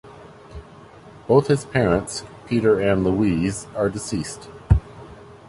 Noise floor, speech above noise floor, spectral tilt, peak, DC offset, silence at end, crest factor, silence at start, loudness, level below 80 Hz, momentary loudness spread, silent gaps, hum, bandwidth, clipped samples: -44 dBFS; 24 dB; -6.5 dB/octave; -2 dBFS; under 0.1%; 0.15 s; 20 dB; 0.05 s; -21 LUFS; -34 dBFS; 23 LU; none; none; 11.5 kHz; under 0.1%